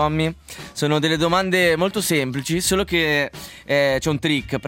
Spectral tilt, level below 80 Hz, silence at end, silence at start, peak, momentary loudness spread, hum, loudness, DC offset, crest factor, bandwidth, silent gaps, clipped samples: -4 dB/octave; -44 dBFS; 0 s; 0 s; -4 dBFS; 8 LU; none; -20 LUFS; under 0.1%; 16 dB; 17 kHz; none; under 0.1%